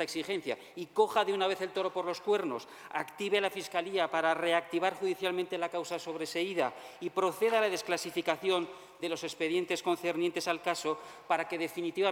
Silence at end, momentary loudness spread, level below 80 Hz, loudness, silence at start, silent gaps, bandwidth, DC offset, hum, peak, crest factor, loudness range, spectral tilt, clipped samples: 0 s; 9 LU; -78 dBFS; -33 LUFS; 0 s; none; 17.5 kHz; under 0.1%; none; -14 dBFS; 18 dB; 1 LU; -3.5 dB/octave; under 0.1%